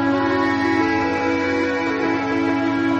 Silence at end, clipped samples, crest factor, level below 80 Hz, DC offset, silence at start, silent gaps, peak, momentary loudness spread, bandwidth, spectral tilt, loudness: 0 s; under 0.1%; 12 dB; -52 dBFS; under 0.1%; 0 s; none; -8 dBFS; 2 LU; 7.8 kHz; -6 dB/octave; -20 LUFS